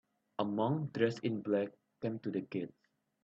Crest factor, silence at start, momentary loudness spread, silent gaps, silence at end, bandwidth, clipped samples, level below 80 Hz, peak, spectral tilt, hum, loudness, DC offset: 20 dB; 0.4 s; 9 LU; none; 0.55 s; 8 kHz; under 0.1%; -78 dBFS; -16 dBFS; -8 dB/octave; none; -37 LUFS; under 0.1%